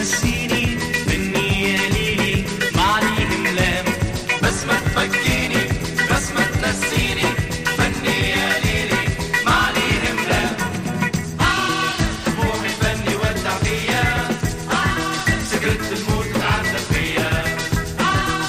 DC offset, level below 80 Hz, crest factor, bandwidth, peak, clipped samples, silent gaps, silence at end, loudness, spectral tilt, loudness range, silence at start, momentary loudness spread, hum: under 0.1%; -32 dBFS; 16 dB; 15.5 kHz; -4 dBFS; under 0.1%; none; 0 s; -19 LUFS; -4 dB/octave; 2 LU; 0 s; 4 LU; none